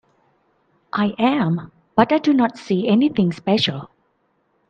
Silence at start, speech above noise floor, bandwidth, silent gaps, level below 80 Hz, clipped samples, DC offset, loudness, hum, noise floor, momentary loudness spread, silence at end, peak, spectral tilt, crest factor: 0.95 s; 48 dB; 8.8 kHz; none; -58 dBFS; under 0.1%; under 0.1%; -19 LUFS; none; -66 dBFS; 7 LU; 0.85 s; 0 dBFS; -7 dB/octave; 20 dB